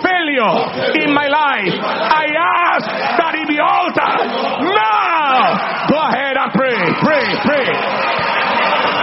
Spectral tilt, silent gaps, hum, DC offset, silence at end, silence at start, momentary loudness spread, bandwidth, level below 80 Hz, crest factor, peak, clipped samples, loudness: -2 dB/octave; none; none; under 0.1%; 0 s; 0 s; 3 LU; 6 kHz; -56 dBFS; 14 dB; 0 dBFS; under 0.1%; -14 LUFS